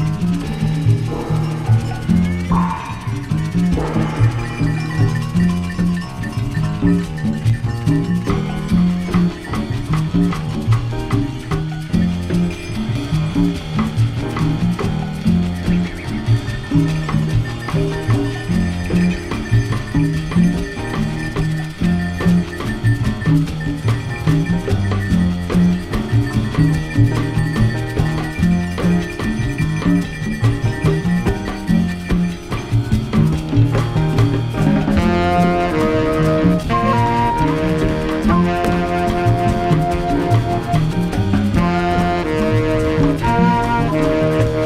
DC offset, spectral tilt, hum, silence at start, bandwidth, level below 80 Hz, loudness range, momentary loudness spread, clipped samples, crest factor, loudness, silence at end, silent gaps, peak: under 0.1%; -7.5 dB/octave; none; 0 s; 13.5 kHz; -28 dBFS; 3 LU; 5 LU; under 0.1%; 16 dB; -18 LUFS; 0 s; none; -2 dBFS